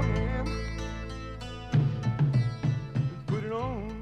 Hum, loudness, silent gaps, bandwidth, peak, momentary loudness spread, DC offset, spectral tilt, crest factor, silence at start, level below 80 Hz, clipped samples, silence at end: none; -31 LUFS; none; 9.8 kHz; -14 dBFS; 12 LU; under 0.1%; -7.5 dB/octave; 14 dB; 0 s; -40 dBFS; under 0.1%; 0 s